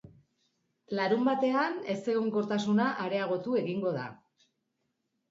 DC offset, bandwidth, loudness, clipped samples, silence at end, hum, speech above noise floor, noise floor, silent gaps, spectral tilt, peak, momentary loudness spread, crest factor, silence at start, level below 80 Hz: under 0.1%; 7.8 kHz; -30 LUFS; under 0.1%; 1.15 s; none; 51 dB; -80 dBFS; none; -6.5 dB/octave; -14 dBFS; 7 LU; 16 dB; 0.05 s; -76 dBFS